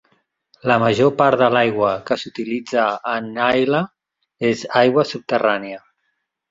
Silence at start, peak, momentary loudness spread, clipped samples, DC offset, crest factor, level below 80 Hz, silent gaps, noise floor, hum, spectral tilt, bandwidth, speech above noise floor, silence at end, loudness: 0.65 s; -2 dBFS; 10 LU; under 0.1%; under 0.1%; 18 dB; -58 dBFS; none; -72 dBFS; none; -6 dB/octave; 7.8 kHz; 55 dB; 0.7 s; -18 LUFS